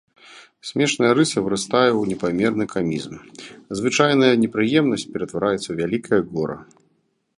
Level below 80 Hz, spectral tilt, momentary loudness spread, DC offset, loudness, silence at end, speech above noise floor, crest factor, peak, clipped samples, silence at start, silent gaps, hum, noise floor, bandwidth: -56 dBFS; -5 dB/octave; 14 LU; under 0.1%; -20 LUFS; 0.75 s; 46 dB; 20 dB; -2 dBFS; under 0.1%; 0.3 s; none; none; -67 dBFS; 11.5 kHz